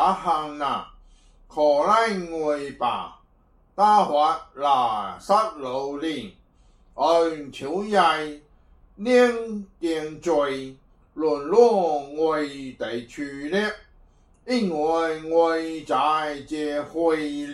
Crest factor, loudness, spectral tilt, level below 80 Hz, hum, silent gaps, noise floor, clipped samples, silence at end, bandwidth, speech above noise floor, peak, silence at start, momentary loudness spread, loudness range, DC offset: 20 dB; -23 LUFS; -5 dB/octave; -56 dBFS; none; none; -59 dBFS; under 0.1%; 0 s; 12 kHz; 36 dB; -4 dBFS; 0 s; 14 LU; 3 LU; under 0.1%